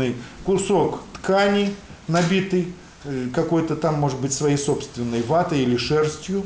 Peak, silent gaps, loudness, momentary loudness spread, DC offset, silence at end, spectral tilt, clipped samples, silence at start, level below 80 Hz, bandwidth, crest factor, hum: -8 dBFS; none; -22 LUFS; 9 LU; under 0.1%; 0 s; -5.5 dB/octave; under 0.1%; 0 s; -48 dBFS; 10 kHz; 14 dB; none